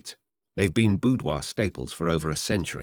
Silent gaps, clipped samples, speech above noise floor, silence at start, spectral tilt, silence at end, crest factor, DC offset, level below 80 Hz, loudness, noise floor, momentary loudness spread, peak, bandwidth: none; under 0.1%; 22 dB; 0.05 s; -5.5 dB/octave; 0 s; 18 dB; under 0.1%; -46 dBFS; -26 LUFS; -47 dBFS; 7 LU; -8 dBFS; over 20 kHz